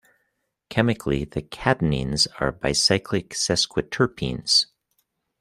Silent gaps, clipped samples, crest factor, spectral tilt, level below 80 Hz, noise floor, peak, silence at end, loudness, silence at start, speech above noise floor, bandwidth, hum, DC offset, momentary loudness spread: none; under 0.1%; 22 dB; -3.5 dB/octave; -44 dBFS; -75 dBFS; -2 dBFS; 0.75 s; -22 LUFS; 0.7 s; 52 dB; 15 kHz; none; under 0.1%; 8 LU